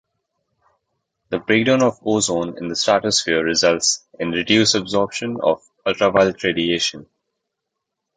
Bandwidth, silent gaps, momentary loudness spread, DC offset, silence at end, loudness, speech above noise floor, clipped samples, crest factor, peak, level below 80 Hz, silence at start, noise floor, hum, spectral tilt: 9.6 kHz; none; 8 LU; under 0.1%; 1.1 s; -18 LUFS; 61 dB; under 0.1%; 18 dB; -2 dBFS; -54 dBFS; 1.3 s; -80 dBFS; none; -3 dB/octave